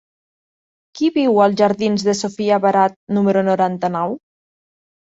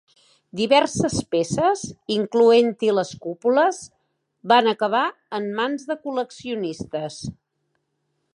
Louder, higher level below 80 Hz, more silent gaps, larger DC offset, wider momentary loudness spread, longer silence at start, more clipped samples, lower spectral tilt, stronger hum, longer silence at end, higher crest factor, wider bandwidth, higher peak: first, -17 LUFS vs -21 LUFS; second, -62 dBFS vs -56 dBFS; first, 2.96-3.07 s vs none; neither; second, 7 LU vs 13 LU; first, 0.95 s vs 0.55 s; neither; first, -6 dB/octave vs -4.5 dB/octave; neither; about the same, 0.9 s vs 1 s; about the same, 16 dB vs 20 dB; second, 7.8 kHz vs 11 kHz; about the same, -2 dBFS vs -2 dBFS